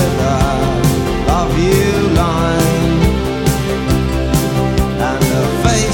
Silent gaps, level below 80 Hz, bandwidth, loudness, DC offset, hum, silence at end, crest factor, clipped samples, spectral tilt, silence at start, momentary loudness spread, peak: none; -22 dBFS; 17.5 kHz; -14 LUFS; under 0.1%; none; 0 s; 12 dB; under 0.1%; -5.5 dB/octave; 0 s; 3 LU; -2 dBFS